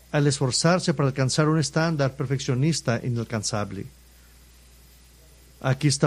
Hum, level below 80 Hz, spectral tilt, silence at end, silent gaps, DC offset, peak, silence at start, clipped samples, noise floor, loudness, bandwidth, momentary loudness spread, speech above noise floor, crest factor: none; -52 dBFS; -5 dB/octave; 0 s; none; under 0.1%; -6 dBFS; 0.15 s; under 0.1%; -52 dBFS; -24 LUFS; 13.5 kHz; 8 LU; 29 dB; 18 dB